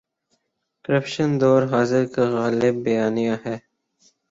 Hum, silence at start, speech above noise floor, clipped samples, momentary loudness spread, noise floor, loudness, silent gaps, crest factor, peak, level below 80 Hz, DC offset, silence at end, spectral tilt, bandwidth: none; 0.9 s; 54 dB; under 0.1%; 11 LU; -74 dBFS; -21 LUFS; none; 16 dB; -6 dBFS; -62 dBFS; under 0.1%; 0.7 s; -7 dB/octave; 7.8 kHz